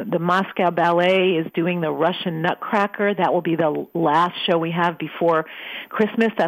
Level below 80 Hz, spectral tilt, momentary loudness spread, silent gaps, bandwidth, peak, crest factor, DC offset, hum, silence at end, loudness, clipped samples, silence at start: -70 dBFS; -7 dB/octave; 5 LU; none; 15 kHz; -6 dBFS; 16 dB; under 0.1%; none; 0 s; -20 LUFS; under 0.1%; 0 s